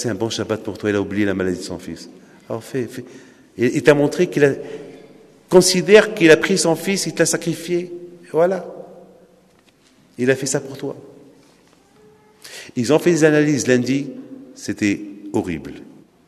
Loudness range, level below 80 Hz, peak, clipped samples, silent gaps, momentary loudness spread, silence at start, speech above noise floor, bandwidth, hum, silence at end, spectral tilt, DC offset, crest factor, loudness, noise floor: 11 LU; -58 dBFS; 0 dBFS; under 0.1%; none; 22 LU; 0 s; 37 dB; 13.5 kHz; none; 0.45 s; -4.5 dB/octave; under 0.1%; 20 dB; -18 LUFS; -54 dBFS